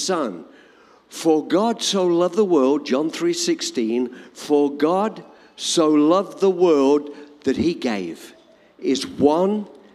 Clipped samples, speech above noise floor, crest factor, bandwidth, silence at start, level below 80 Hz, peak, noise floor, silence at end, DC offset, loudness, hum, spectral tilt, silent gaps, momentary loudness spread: under 0.1%; 32 dB; 18 dB; 14 kHz; 0 s; -62 dBFS; -4 dBFS; -51 dBFS; 0.25 s; under 0.1%; -20 LUFS; none; -4.5 dB/octave; none; 12 LU